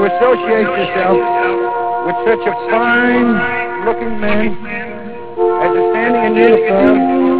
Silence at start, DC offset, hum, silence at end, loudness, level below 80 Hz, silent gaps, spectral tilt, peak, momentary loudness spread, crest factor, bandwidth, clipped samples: 0 s; under 0.1%; none; 0 s; -13 LUFS; -44 dBFS; none; -9.5 dB/octave; 0 dBFS; 8 LU; 14 dB; 4 kHz; under 0.1%